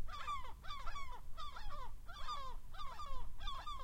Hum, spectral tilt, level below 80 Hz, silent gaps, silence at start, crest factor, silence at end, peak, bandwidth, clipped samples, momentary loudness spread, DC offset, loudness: none; -3 dB/octave; -48 dBFS; none; 0 s; 12 dB; 0 s; -28 dBFS; 8.8 kHz; under 0.1%; 6 LU; under 0.1%; -49 LUFS